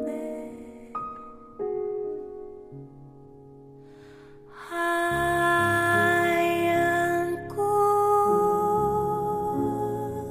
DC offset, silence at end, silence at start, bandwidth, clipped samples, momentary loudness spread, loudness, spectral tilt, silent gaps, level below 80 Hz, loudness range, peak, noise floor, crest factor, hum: under 0.1%; 0 s; 0 s; 15.5 kHz; under 0.1%; 20 LU; -25 LUFS; -5.5 dB/octave; none; -54 dBFS; 14 LU; -10 dBFS; -48 dBFS; 16 dB; none